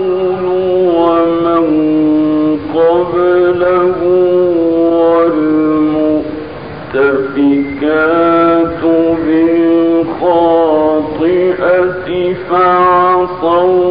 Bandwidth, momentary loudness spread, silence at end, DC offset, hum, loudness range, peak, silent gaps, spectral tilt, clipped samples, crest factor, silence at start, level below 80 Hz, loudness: 5.2 kHz; 4 LU; 0 s; 0.8%; none; 2 LU; 0 dBFS; none; -11.5 dB/octave; under 0.1%; 10 dB; 0 s; -42 dBFS; -11 LUFS